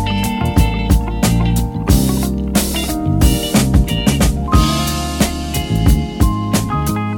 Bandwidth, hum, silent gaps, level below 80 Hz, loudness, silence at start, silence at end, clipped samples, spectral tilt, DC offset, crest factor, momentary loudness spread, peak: 19 kHz; none; none; -20 dBFS; -16 LUFS; 0 s; 0 s; under 0.1%; -5 dB/octave; under 0.1%; 14 dB; 4 LU; 0 dBFS